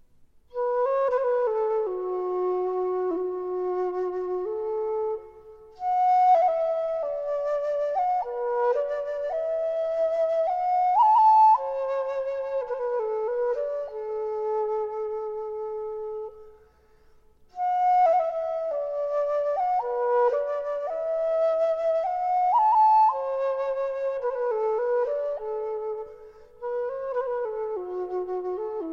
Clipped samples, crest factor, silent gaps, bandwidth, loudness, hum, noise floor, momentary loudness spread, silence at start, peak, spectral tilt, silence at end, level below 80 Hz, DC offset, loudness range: under 0.1%; 14 dB; none; 7 kHz; -25 LUFS; none; -57 dBFS; 11 LU; 0.55 s; -12 dBFS; -5.5 dB/octave; 0 s; -62 dBFS; under 0.1%; 8 LU